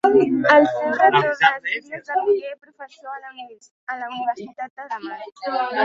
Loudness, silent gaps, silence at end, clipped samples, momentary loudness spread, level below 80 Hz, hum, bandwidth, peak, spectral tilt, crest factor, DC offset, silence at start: -19 LUFS; 3.71-3.87 s, 4.70-4.76 s; 0 s; under 0.1%; 20 LU; -68 dBFS; none; 7.6 kHz; -2 dBFS; -5.5 dB/octave; 20 dB; under 0.1%; 0.05 s